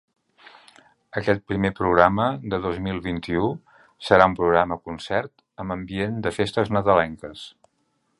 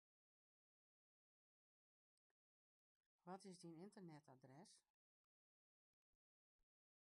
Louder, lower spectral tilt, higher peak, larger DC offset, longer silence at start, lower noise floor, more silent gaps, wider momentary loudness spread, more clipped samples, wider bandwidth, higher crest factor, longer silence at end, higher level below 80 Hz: first, -22 LUFS vs -63 LUFS; about the same, -6.5 dB/octave vs -5.5 dB/octave; first, 0 dBFS vs -46 dBFS; neither; second, 1.15 s vs 3.25 s; second, -70 dBFS vs under -90 dBFS; neither; first, 18 LU vs 8 LU; neither; about the same, 11.5 kHz vs 11 kHz; about the same, 24 dB vs 22 dB; second, 0.7 s vs 2.3 s; first, -46 dBFS vs under -90 dBFS